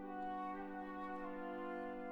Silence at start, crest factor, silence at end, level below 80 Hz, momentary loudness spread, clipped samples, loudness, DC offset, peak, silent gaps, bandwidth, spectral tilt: 0 s; 10 dB; 0 s; -68 dBFS; 2 LU; under 0.1%; -46 LUFS; under 0.1%; -34 dBFS; none; 19 kHz; -7.5 dB/octave